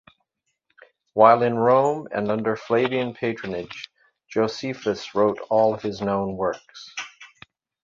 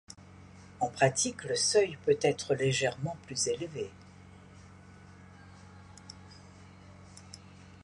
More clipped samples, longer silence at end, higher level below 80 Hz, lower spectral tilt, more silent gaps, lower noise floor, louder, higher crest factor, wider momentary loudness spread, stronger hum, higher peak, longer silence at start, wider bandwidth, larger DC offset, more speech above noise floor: neither; first, 0.55 s vs 0.05 s; about the same, -60 dBFS vs -62 dBFS; first, -6 dB/octave vs -3.5 dB/octave; neither; first, -75 dBFS vs -53 dBFS; first, -22 LUFS vs -30 LUFS; about the same, 22 dB vs 22 dB; second, 17 LU vs 26 LU; neither; first, -2 dBFS vs -12 dBFS; first, 1.15 s vs 0.1 s; second, 7.4 kHz vs 11.5 kHz; neither; first, 54 dB vs 23 dB